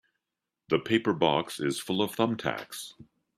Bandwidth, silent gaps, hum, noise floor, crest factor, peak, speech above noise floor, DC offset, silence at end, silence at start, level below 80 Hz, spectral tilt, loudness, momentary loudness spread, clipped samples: 15.5 kHz; none; none; -87 dBFS; 20 dB; -10 dBFS; 59 dB; under 0.1%; 0.35 s; 0.7 s; -68 dBFS; -5 dB/octave; -28 LUFS; 13 LU; under 0.1%